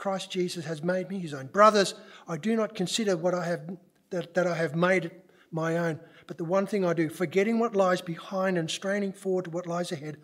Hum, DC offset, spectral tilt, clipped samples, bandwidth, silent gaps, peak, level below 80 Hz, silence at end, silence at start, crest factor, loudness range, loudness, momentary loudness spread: none; under 0.1%; -5 dB/octave; under 0.1%; 16 kHz; none; -6 dBFS; -82 dBFS; 0.1 s; 0 s; 22 dB; 3 LU; -28 LUFS; 11 LU